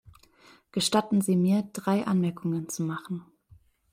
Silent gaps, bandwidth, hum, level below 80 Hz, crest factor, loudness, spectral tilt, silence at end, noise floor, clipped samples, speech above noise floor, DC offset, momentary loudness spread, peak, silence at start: none; 16 kHz; none; -66 dBFS; 18 dB; -27 LUFS; -5.5 dB/octave; 0.7 s; -59 dBFS; under 0.1%; 32 dB; under 0.1%; 12 LU; -10 dBFS; 0.75 s